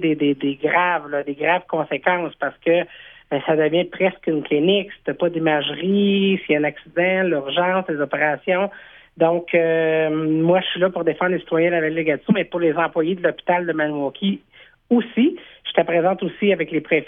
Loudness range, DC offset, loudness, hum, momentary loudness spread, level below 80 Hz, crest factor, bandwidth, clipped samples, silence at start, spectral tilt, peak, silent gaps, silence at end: 2 LU; under 0.1%; -20 LUFS; none; 5 LU; -62 dBFS; 18 dB; 3.8 kHz; under 0.1%; 0 s; -9.5 dB/octave; -2 dBFS; none; 0 s